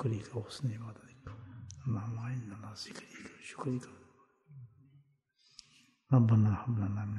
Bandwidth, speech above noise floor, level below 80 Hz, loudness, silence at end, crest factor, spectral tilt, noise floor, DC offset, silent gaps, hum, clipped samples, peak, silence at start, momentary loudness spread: 11 kHz; 38 dB; -66 dBFS; -34 LUFS; 0 s; 20 dB; -7.5 dB/octave; -71 dBFS; under 0.1%; none; none; under 0.1%; -16 dBFS; 0 s; 25 LU